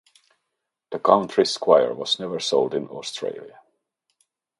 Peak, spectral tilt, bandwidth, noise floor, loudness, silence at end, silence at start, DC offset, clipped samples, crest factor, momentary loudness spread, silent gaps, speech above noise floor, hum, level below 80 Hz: 0 dBFS; -4 dB/octave; 11.5 kHz; -81 dBFS; -22 LUFS; 1.1 s; 0.9 s; under 0.1%; under 0.1%; 24 dB; 14 LU; none; 59 dB; none; -72 dBFS